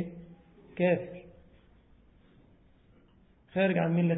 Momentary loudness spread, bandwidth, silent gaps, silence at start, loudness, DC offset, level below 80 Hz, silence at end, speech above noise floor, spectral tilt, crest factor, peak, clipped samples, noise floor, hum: 23 LU; 4 kHz; none; 0 s; -29 LUFS; under 0.1%; -64 dBFS; 0 s; 35 dB; -11 dB/octave; 18 dB; -16 dBFS; under 0.1%; -62 dBFS; none